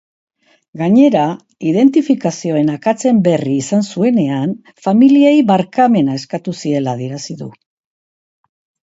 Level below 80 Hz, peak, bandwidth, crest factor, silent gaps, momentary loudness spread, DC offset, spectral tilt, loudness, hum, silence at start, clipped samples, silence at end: -62 dBFS; 0 dBFS; 8 kHz; 14 dB; none; 12 LU; under 0.1%; -6.5 dB/octave; -14 LUFS; none; 0.75 s; under 0.1%; 1.4 s